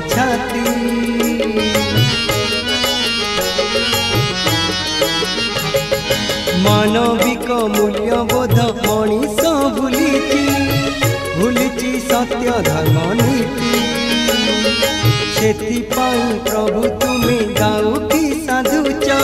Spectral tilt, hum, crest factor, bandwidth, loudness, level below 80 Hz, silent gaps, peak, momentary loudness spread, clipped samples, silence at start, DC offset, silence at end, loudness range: -4.5 dB/octave; none; 16 dB; 16.5 kHz; -15 LUFS; -36 dBFS; none; 0 dBFS; 3 LU; under 0.1%; 0 s; under 0.1%; 0 s; 1 LU